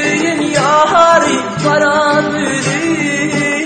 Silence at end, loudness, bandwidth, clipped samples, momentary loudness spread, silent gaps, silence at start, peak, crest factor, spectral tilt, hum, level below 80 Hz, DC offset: 0 s; -12 LUFS; 9.2 kHz; under 0.1%; 6 LU; none; 0 s; 0 dBFS; 12 dB; -4 dB/octave; none; -50 dBFS; under 0.1%